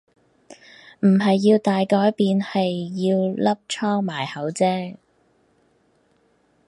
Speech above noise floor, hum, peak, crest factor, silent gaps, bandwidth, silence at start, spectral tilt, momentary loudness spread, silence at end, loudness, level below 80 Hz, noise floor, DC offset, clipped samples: 43 dB; none; -6 dBFS; 16 dB; none; 11.5 kHz; 0.5 s; -6.5 dB/octave; 9 LU; 1.75 s; -21 LUFS; -68 dBFS; -62 dBFS; under 0.1%; under 0.1%